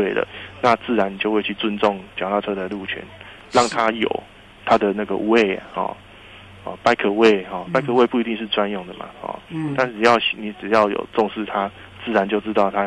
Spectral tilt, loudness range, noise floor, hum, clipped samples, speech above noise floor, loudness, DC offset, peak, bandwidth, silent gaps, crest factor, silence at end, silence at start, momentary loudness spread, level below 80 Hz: -5 dB/octave; 2 LU; -43 dBFS; none; under 0.1%; 22 dB; -20 LUFS; under 0.1%; -2 dBFS; 11 kHz; none; 18 dB; 0 s; 0 s; 14 LU; -54 dBFS